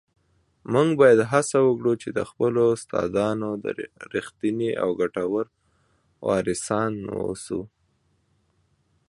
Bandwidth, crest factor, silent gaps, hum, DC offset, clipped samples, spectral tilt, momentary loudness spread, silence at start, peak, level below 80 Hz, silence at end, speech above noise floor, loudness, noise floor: 11.5 kHz; 20 dB; none; none; under 0.1%; under 0.1%; -6 dB/octave; 13 LU; 0.7 s; -4 dBFS; -58 dBFS; 1.45 s; 45 dB; -24 LUFS; -68 dBFS